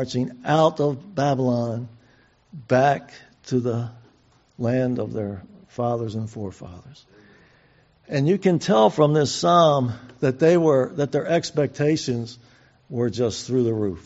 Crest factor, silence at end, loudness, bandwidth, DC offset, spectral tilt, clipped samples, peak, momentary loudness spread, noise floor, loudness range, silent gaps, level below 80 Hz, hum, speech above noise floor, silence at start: 18 dB; 0.05 s; -22 LUFS; 8 kHz; under 0.1%; -6 dB/octave; under 0.1%; -4 dBFS; 15 LU; -58 dBFS; 9 LU; none; -58 dBFS; none; 37 dB; 0 s